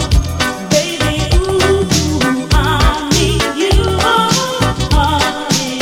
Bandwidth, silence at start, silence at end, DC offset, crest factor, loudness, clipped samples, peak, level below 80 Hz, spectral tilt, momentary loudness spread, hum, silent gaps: 17 kHz; 0 s; 0 s; under 0.1%; 12 dB; -13 LUFS; under 0.1%; 0 dBFS; -20 dBFS; -4 dB/octave; 4 LU; none; none